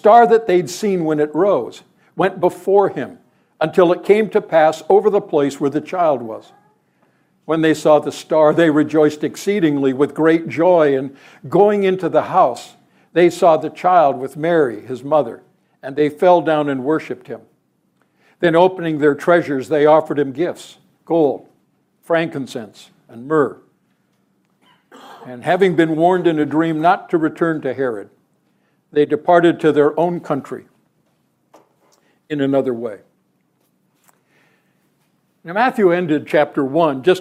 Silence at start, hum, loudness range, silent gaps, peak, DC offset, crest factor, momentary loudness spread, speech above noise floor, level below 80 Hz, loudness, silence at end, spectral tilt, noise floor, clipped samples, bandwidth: 0.05 s; none; 8 LU; none; 0 dBFS; under 0.1%; 16 dB; 14 LU; 48 dB; -68 dBFS; -16 LUFS; 0 s; -6.5 dB/octave; -63 dBFS; under 0.1%; 15 kHz